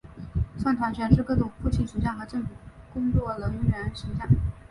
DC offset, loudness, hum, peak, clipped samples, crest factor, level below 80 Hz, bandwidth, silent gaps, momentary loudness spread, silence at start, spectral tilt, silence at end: under 0.1%; -27 LUFS; none; -6 dBFS; under 0.1%; 22 dB; -36 dBFS; 11.5 kHz; none; 11 LU; 0.05 s; -8.5 dB/octave; 0.1 s